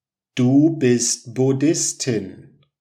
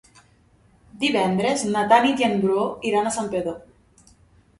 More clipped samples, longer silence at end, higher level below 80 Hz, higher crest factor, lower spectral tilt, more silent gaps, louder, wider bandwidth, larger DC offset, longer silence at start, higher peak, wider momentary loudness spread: neither; second, 0.5 s vs 1 s; second, -70 dBFS vs -58 dBFS; second, 14 dB vs 20 dB; about the same, -5 dB/octave vs -4.5 dB/octave; neither; about the same, -19 LUFS vs -21 LUFS; first, 14 kHz vs 11.5 kHz; neither; second, 0.35 s vs 0.95 s; about the same, -4 dBFS vs -4 dBFS; about the same, 10 LU vs 10 LU